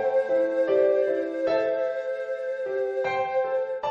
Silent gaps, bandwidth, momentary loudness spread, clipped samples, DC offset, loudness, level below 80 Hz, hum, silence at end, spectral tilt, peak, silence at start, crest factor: none; 7 kHz; 8 LU; under 0.1%; under 0.1%; -25 LUFS; -70 dBFS; none; 0 s; -5.5 dB/octave; -12 dBFS; 0 s; 14 dB